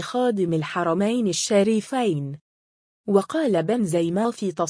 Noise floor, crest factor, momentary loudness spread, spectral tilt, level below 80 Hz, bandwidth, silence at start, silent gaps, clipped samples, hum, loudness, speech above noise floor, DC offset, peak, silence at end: under -90 dBFS; 16 dB; 6 LU; -5.5 dB/octave; -66 dBFS; 10.5 kHz; 0 s; 2.41-3.04 s; under 0.1%; none; -22 LUFS; over 68 dB; under 0.1%; -6 dBFS; 0 s